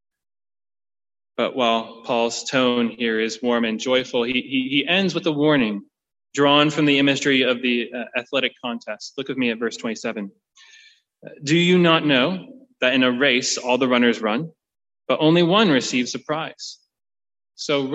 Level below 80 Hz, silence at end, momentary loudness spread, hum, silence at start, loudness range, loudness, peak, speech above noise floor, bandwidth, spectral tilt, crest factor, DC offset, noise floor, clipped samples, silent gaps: -66 dBFS; 0 s; 15 LU; none; 1.4 s; 5 LU; -20 LUFS; -4 dBFS; 32 dB; 8.4 kHz; -4.5 dB/octave; 18 dB; under 0.1%; -52 dBFS; under 0.1%; none